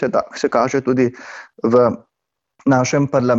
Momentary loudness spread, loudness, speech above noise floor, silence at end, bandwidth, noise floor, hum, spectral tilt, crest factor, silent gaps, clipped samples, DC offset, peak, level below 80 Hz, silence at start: 12 LU; -17 LUFS; 64 dB; 0 s; 8 kHz; -80 dBFS; none; -6 dB/octave; 16 dB; none; under 0.1%; under 0.1%; -2 dBFS; -56 dBFS; 0 s